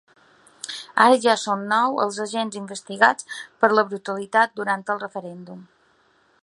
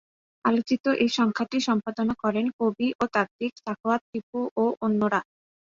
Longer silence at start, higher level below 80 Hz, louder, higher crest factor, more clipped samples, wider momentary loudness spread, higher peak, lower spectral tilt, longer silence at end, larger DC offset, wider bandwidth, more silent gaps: first, 0.65 s vs 0.45 s; second, -76 dBFS vs -64 dBFS; first, -21 LUFS vs -26 LUFS; about the same, 22 dB vs 18 dB; neither; first, 17 LU vs 7 LU; first, 0 dBFS vs -8 dBFS; second, -3.5 dB/octave vs -5.5 dB/octave; first, 0.8 s vs 0.55 s; neither; first, 11.5 kHz vs 7.6 kHz; second, none vs 0.80-0.84 s, 2.53-2.59 s, 2.95-2.99 s, 3.31-3.39 s, 4.01-4.13 s, 4.23-4.33 s, 4.51-4.56 s